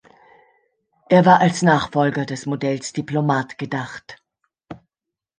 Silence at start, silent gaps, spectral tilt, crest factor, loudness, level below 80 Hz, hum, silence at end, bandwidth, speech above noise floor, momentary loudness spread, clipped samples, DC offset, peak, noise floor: 1.1 s; none; -6 dB/octave; 18 dB; -19 LUFS; -58 dBFS; none; 0.65 s; 9.8 kHz; 68 dB; 13 LU; under 0.1%; under 0.1%; -2 dBFS; -86 dBFS